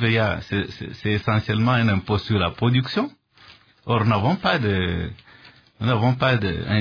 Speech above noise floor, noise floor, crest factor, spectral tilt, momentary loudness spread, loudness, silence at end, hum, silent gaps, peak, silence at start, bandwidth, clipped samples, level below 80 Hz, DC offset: 30 dB; -51 dBFS; 16 dB; -8 dB/octave; 9 LU; -22 LUFS; 0 s; none; none; -4 dBFS; 0 s; 5.4 kHz; under 0.1%; -46 dBFS; under 0.1%